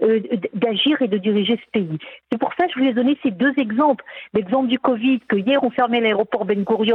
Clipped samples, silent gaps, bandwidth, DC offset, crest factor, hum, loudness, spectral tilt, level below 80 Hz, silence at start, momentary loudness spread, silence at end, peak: under 0.1%; none; 4.3 kHz; under 0.1%; 14 dB; none; -20 LUFS; -8.5 dB/octave; -64 dBFS; 0 s; 7 LU; 0 s; -4 dBFS